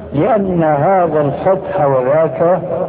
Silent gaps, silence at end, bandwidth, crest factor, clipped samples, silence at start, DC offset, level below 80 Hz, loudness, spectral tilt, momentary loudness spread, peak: none; 0 s; 4 kHz; 12 dB; under 0.1%; 0 s; under 0.1%; -44 dBFS; -13 LUFS; -12.5 dB/octave; 2 LU; -2 dBFS